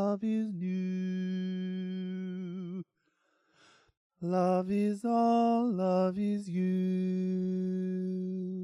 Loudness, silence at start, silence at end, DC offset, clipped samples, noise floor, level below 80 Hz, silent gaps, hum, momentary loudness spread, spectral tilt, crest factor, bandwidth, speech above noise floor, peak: -32 LUFS; 0 s; 0 s; under 0.1%; under 0.1%; -76 dBFS; -76 dBFS; 3.97-4.10 s; none; 10 LU; -9 dB/octave; 12 dB; 10 kHz; 46 dB; -18 dBFS